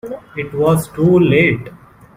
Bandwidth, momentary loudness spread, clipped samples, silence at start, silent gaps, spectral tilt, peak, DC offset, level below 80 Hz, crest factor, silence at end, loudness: 16 kHz; 14 LU; under 0.1%; 0.05 s; none; -7 dB/octave; 0 dBFS; under 0.1%; -46 dBFS; 14 dB; 0.4 s; -14 LUFS